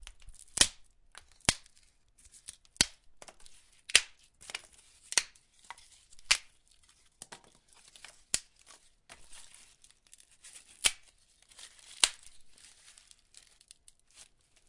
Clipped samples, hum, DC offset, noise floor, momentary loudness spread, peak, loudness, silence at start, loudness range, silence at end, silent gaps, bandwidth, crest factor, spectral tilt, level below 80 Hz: under 0.1%; none; under 0.1%; -65 dBFS; 26 LU; -2 dBFS; -30 LUFS; 0.3 s; 11 LU; 2.25 s; none; 11.5 kHz; 36 dB; 0.5 dB/octave; -60 dBFS